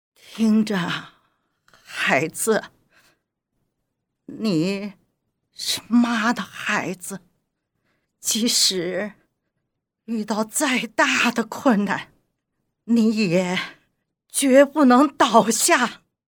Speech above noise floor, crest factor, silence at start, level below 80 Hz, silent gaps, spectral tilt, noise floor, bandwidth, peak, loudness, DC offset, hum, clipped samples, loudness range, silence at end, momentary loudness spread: 58 dB; 22 dB; 0.3 s; -68 dBFS; none; -3.5 dB/octave; -78 dBFS; over 20 kHz; 0 dBFS; -20 LUFS; under 0.1%; none; under 0.1%; 8 LU; 0.35 s; 14 LU